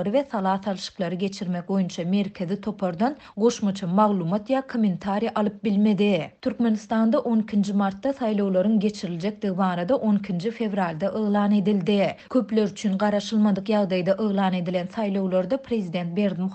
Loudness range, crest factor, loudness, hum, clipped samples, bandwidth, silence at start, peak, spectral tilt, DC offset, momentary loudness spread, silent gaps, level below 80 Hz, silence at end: 2 LU; 16 dB; -24 LUFS; none; under 0.1%; 8.4 kHz; 0 s; -6 dBFS; -7 dB/octave; under 0.1%; 6 LU; none; -64 dBFS; 0 s